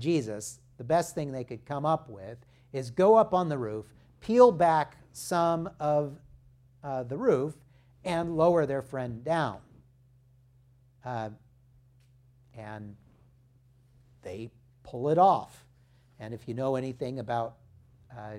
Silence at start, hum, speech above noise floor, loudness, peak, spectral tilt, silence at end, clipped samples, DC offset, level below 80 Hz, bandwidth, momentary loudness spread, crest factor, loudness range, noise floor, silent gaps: 0 s; none; 34 dB; -28 LUFS; -6 dBFS; -6.5 dB/octave; 0 s; under 0.1%; under 0.1%; -62 dBFS; 15 kHz; 22 LU; 24 dB; 19 LU; -62 dBFS; none